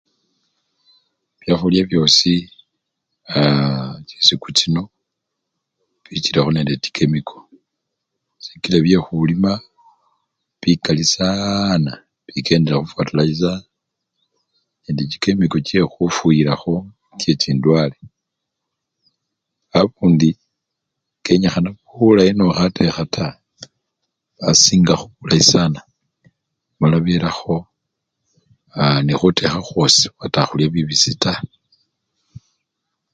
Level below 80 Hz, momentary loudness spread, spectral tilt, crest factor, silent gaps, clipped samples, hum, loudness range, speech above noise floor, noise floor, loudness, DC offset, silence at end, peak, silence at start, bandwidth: -46 dBFS; 13 LU; -4.5 dB/octave; 18 dB; none; under 0.1%; none; 5 LU; 63 dB; -79 dBFS; -16 LUFS; under 0.1%; 0.75 s; 0 dBFS; 1.45 s; 9.2 kHz